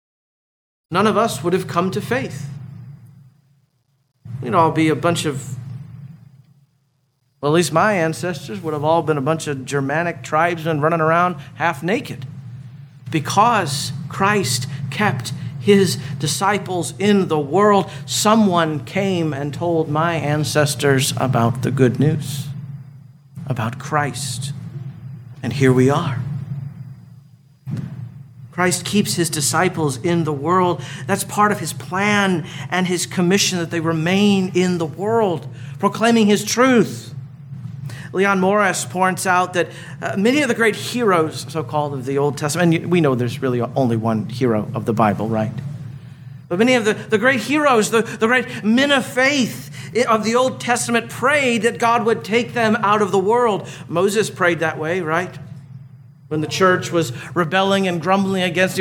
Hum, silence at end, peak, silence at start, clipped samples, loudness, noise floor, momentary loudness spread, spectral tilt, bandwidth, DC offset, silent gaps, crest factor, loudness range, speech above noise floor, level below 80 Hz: none; 0 s; -2 dBFS; 0.9 s; under 0.1%; -18 LUFS; -65 dBFS; 16 LU; -5 dB/octave; 18.5 kHz; under 0.1%; none; 18 dB; 5 LU; 47 dB; -58 dBFS